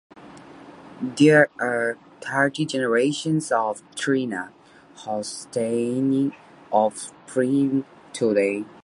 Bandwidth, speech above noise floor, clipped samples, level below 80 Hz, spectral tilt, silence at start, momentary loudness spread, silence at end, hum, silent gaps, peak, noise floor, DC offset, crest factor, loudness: 11.5 kHz; 22 dB; under 0.1%; -70 dBFS; -5 dB/octave; 0.15 s; 13 LU; 0.15 s; none; none; -4 dBFS; -44 dBFS; under 0.1%; 20 dB; -23 LUFS